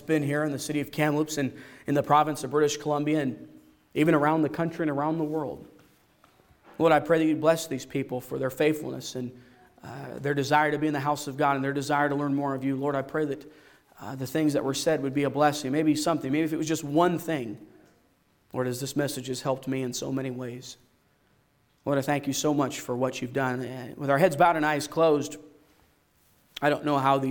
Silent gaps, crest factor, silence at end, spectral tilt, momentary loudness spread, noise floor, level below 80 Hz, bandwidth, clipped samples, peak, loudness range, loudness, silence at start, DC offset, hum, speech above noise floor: none; 18 dB; 0 s; -5.5 dB/octave; 14 LU; -66 dBFS; -66 dBFS; 18 kHz; under 0.1%; -8 dBFS; 5 LU; -27 LUFS; 0 s; under 0.1%; none; 40 dB